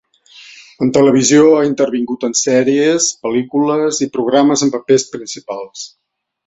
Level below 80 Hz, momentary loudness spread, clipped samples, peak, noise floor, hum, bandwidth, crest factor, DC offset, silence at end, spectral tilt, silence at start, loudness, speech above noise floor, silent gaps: -58 dBFS; 16 LU; under 0.1%; 0 dBFS; -42 dBFS; none; 8.4 kHz; 14 dB; under 0.1%; 0.6 s; -4 dB/octave; 0.4 s; -13 LUFS; 28 dB; none